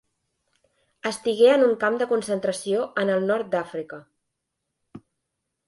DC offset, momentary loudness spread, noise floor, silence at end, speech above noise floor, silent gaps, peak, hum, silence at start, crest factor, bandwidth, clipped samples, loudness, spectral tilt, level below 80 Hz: under 0.1%; 16 LU; -81 dBFS; 0.7 s; 59 dB; none; -6 dBFS; none; 1.05 s; 20 dB; 11.5 kHz; under 0.1%; -23 LUFS; -4.5 dB/octave; -72 dBFS